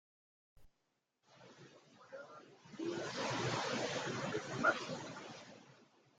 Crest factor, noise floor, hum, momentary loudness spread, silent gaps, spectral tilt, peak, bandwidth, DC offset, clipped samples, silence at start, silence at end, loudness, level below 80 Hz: 24 dB; -85 dBFS; none; 24 LU; none; -4 dB/octave; -20 dBFS; 9.6 kHz; under 0.1%; under 0.1%; 0.55 s; 0.35 s; -39 LUFS; -76 dBFS